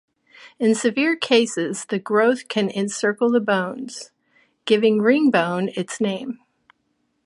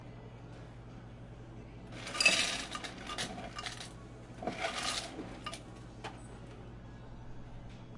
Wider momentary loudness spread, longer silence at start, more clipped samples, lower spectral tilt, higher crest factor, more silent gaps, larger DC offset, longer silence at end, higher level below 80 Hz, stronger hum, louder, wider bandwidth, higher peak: second, 14 LU vs 21 LU; first, 0.4 s vs 0 s; neither; first, -4.5 dB/octave vs -2 dB/octave; second, 18 dB vs 30 dB; neither; neither; first, 0.9 s vs 0 s; second, -72 dBFS vs -56 dBFS; neither; first, -20 LUFS vs -35 LUFS; about the same, 11.5 kHz vs 11.5 kHz; first, -2 dBFS vs -10 dBFS